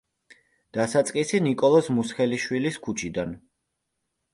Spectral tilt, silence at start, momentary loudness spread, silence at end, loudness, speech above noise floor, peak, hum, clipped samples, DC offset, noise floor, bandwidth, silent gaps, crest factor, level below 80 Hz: -5 dB/octave; 0.75 s; 12 LU; 0.95 s; -24 LUFS; 56 dB; -8 dBFS; none; under 0.1%; under 0.1%; -79 dBFS; 11.5 kHz; none; 18 dB; -60 dBFS